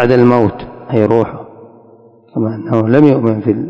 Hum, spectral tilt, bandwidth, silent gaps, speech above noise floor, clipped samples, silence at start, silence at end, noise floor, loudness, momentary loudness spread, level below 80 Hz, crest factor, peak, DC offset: none; -10 dB/octave; 8 kHz; none; 32 dB; 1%; 0 s; 0 s; -43 dBFS; -12 LUFS; 14 LU; -46 dBFS; 12 dB; 0 dBFS; under 0.1%